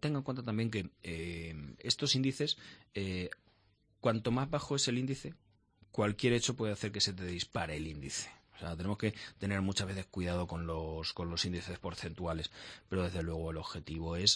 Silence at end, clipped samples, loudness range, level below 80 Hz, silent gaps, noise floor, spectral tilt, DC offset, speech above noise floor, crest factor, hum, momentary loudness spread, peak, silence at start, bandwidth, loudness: 0 s; under 0.1%; 4 LU; -54 dBFS; none; -71 dBFS; -4.5 dB/octave; under 0.1%; 35 dB; 24 dB; none; 12 LU; -14 dBFS; 0 s; 10.5 kHz; -36 LUFS